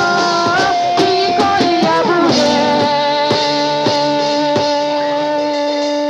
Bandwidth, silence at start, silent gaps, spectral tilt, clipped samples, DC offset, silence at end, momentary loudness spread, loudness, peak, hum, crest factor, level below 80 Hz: 11 kHz; 0 s; none; -4 dB/octave; under 0.1%; under 0.1%; 0 s; 4 LU; -14 LUFS; -2 dBFS; none; 12 dB; -54 dBFS